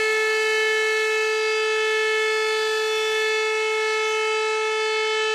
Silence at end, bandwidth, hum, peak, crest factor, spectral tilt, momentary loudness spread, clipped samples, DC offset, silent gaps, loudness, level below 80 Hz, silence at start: 0 s; 14.5 kHz; none; -12 dBFS; 10 dB; 1.5 dB/octave; 2 LU; under 0.1%; under 0.1%; none; -21 LUFS; -70 dBFS; 0 s